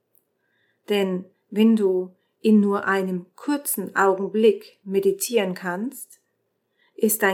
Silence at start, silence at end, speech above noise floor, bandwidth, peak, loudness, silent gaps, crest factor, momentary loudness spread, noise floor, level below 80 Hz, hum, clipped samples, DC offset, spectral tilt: 0.9 s; 0 s; 52 dB; 19 kHz; -4 dBFS; -22 LUFS; none; 18 dB; 13 LU; -73 dBFS; -88 dBFS; none; under 0.1%; under 0.1%; -5 dB/octave